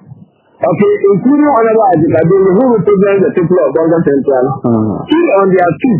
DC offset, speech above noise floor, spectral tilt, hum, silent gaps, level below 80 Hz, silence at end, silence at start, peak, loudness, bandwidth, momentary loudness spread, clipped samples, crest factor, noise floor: under 0.1%; 29 dB; -12 dB/octave; none; none; -46 dBFS; 0 s; 0.6 s; 0 dBFS; -10 LUFS; 3.2 kHz; 4 LU; 0.1%; 10 dB; -38 dBFS